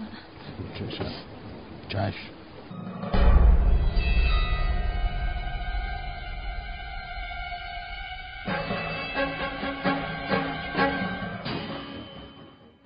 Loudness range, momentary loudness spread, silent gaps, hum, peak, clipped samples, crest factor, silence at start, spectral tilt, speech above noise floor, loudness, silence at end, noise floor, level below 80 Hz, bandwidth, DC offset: 8 LU; 16 LU; none; none; -8 dBFS; under 0.1%; 18 dB; 0 s; -4.5 dB/octave; 17 dB; -29 LUFS; 0.15 s; -50 dBFS; -28 dBFS; 5.2 kHz; under 0.1%